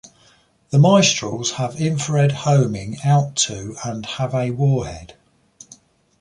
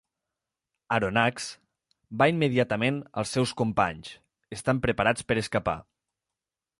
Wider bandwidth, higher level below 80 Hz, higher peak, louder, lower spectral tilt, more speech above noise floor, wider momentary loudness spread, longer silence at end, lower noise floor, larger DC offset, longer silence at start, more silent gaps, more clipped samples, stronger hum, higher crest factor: about the same, 11 kHz vs 11.5 kHz; about the same, -50 dBFS vs -54 dBFS; first, -2 dBFS vs -8 dBFS; first, -19 LUFS vs -27 LUFS; about the same, -5 dB/octave vs -5.5 dB/octave; second, 37 dB vs 63 dB; about the same, 14 LU vs 14 LU; about the same, 1.1 s vs 1 s; second, -56 dBFS vs -89 dBFS; neither; second, 0.7 s vs 0.9 s; neither; neither; neither; about the same, 18 dB vs 20 dB